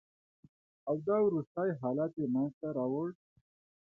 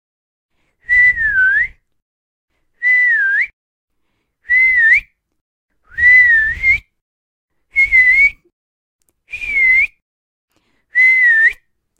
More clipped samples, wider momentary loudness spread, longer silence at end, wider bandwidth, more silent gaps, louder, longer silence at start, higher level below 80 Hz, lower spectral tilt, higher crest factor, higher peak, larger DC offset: neither; second, 8 LU vs 11 LU; first, 0.75 s vs 0.45 s; second, 2.3 kHz vs 9.4 kHz; second, 1.47-1.55 s, 2.54-2.61 s vs 2.02-2.48 s, 3.53-3.88 s, 5.41-5.69 s, 7.01-7.48 s, 8.53-8.99 s, 10.02-10.48 s; second, -34 LUFS vs -11 LUFS; about the same, 0.85 s vs 0.9 s; second, -78 dBFS vs -44 dBFS; first, -12 dB/octave vs -1.5 dB/octave; about the same, 16 dB vs 14 dB; second, -18 dBFS vs -2 dBFS; neither